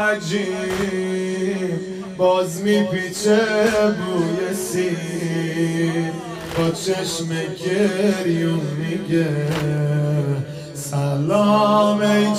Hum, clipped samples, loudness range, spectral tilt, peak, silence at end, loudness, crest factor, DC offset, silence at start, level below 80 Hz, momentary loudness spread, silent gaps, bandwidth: none; under 0.1%; 3 LU; -5.5 dB/octave; -6 dBFS; 0 s; -20 LUFS; 14 dB; under 0.1%; 0 s; -54 dBFS; 8 LU; none; 15.5 kHz